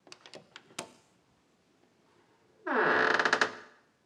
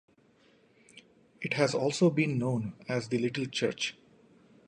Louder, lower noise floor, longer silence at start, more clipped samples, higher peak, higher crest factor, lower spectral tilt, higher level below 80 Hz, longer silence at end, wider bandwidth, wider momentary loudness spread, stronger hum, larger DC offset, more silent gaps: first, -27 LUFS vs -30 LUFS; first, -69 dBFS vs -64 dBFS; second, 0.25 s vs 0.95 s; neither; first, -8 dBFS vs -12 dBFS; about the same, 24 dB vs 20 dB; second, -2.5 dB/octave vs -5.5 dB/octave; second, -88 dBFS vs -72 dBFS; second, 0.4 s vs 0.75 s; first, 14.5 kHz vs 11 kHz; first, 25 LU vs 9 LU; neither; neither; neither